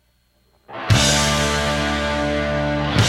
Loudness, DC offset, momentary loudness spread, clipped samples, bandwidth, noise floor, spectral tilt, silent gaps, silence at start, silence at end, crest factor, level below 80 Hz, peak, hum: -18 LUFS; under 0.1%; 6 LU; under 0.1%; 16 kHz; -61 dBFS; -4 dB/octave; none; 0.7 s; 0 s; 18 dB; -32 dBFS; -2 dBFS; 60 Hz at -45 dBFS